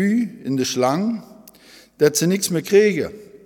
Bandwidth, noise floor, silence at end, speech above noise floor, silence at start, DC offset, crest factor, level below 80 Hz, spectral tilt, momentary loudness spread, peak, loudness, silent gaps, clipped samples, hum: 19 kHz; -48 dBFS; 0.2 s; 29 dB; 0 s; under 0.1%; 18 dB; -62 dBFS; -4.5 dB/octave; 10 LU; -2 dBFS; -19 LUFS; none; under 0.1%; none